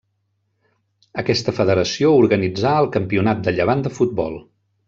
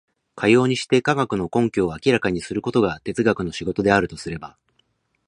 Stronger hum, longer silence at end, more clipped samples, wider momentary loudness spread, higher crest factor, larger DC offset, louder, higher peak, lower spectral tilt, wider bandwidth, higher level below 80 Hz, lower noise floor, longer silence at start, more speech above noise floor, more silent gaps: neither; second, 0.45 s vs 0.8 s; neither; about the same, 11 LU vs 10 LU; about the same, 16 dB vs 20 dB; neither; first, -18 LUFS vs -21 LUFS; about the same, -4 dBFS vs -2 dBFS; about the same, -6 dB/octave vs -6 dB/octave; second, 7.8 kHz vs 10.5 kHz; about the same, -52 dBFS vs -48 dBFS; about the same, -69 dBFS vs -67 dBFS; first, 1.15 s vs 0.35 s; first, 52 dB vs 47 dB; neither